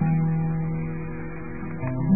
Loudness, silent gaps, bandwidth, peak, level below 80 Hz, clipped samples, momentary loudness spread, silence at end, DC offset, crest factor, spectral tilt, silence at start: -28 LUFS; none; 2.7 kHz; -10 dBFS; -44 dBFS; under 0.1%; 11 LU; 0 s; 1%; 16 dB; -16 dB/octave; 0 s